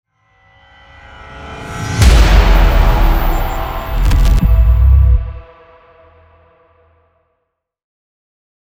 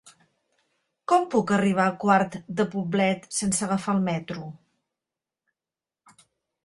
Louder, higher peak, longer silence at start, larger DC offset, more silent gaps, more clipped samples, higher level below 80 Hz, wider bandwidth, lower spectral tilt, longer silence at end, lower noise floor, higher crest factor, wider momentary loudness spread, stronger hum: first, -13 LUFS vs -24 LUFS; first, 0 dBFS vs -6 dBFS; first, 1.3 s vs 1.1 s; neither; neither; neither; first, -14 dBFS vs -64 dBFS; first, 16.5 kHz vs 11.5 kHz; about the same, -5.5 dB/octave vs -5 dB/octave; first, 3.25 s vs 2.1 s; second, -72 dBFS vs under -90 dBFS; second, 12 dB vs 20 dB; first, 19 LU vs 11 LU; neither